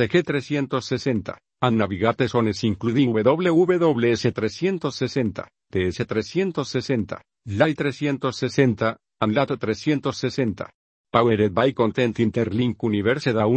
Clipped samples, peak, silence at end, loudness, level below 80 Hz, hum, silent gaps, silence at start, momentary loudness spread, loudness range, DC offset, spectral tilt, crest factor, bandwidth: under 0.1%; 0 dBFS; 0 s; -22 LUFS; -56 dBFS; none; 10.74-11.04 s; 0 s; 7 LU; 4 LU; under 0.1%; -6.5 dB/octave; 22 dB; 8.6 kHz